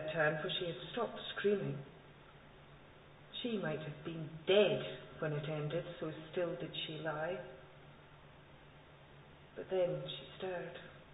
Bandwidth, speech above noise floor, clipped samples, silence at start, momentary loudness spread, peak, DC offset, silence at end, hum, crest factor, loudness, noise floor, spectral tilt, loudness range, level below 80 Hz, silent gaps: 3.9 kHz; 21 dB; under 0.1%; 0 s; 24 LU; -18 dBFS; under 0.1%; 0 s; none; 22 dB; -39 LUFS; -59 dBFS; -3.5 dB/octave; 7 LU; -70 dBFS; none